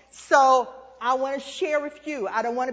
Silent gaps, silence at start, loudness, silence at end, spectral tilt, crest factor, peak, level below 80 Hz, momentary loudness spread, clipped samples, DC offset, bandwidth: none; 0.15 s; -23 LUFS; 0 s; -2.5 dB/octave; 20 dB; -4 dBFS; -68 dBFS; 13 LU; under 0.1%; under 0.1%; 8 kHz